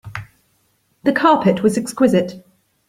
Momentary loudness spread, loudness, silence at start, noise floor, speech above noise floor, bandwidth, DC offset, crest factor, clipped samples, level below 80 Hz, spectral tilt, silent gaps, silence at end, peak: 16 LU; -16 LUFS; 0.05 s; -63 dBFS; 47 dB; 15.5 kHz; under 0.1%; 16 dB; under 0.1%; -56 dBFS; -6 dB/octave; none; 0.5 s; -2 dBFS